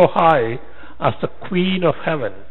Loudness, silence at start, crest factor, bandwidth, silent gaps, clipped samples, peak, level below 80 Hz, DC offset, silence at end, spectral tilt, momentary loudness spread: -19 LUFS; 0 s; 18 dB; 4.3 kHz; none; under 0.1%; 0 dBFS; -48 dBFS; 4%; 0.1 s; -8.5 dB/octave; 10 LU